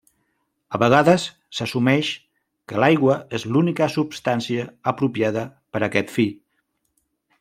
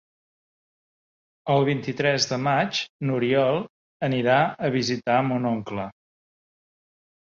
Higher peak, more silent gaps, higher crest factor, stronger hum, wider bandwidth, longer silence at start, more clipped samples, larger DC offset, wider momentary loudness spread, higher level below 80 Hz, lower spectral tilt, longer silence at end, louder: first, -2 dBFS vs -8 dBFS; second, none vs 2.89-2.99 s, 3.70-4.00 s; about the same, 20 dB vs 18 dB; neither; first, 15.5 kHz vs 7.6 kHz; second, 0.7 s vs 1.45 s; neither; neither; about the same, 12 LU vs 10 LU; about the same, -62 dBFS vs -64 dBFS; about the same, -6 dB/octave vs -5 dB/octave; second, 1.05 s vs 1.45 s; first, -21 LUFS vs -24 LUFS